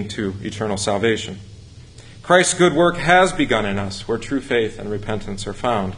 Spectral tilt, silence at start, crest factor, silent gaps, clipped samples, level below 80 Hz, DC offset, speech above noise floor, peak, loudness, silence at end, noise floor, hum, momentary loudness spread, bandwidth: -4 dB/octave; 0 s; 20 dB; none; under 0.1%; -42 dBFS; under 0.1%; 22 dB; 0 dBFS; -19 LUFS; 0 s; -41 dBFS; none; 13 LU; 11 kHz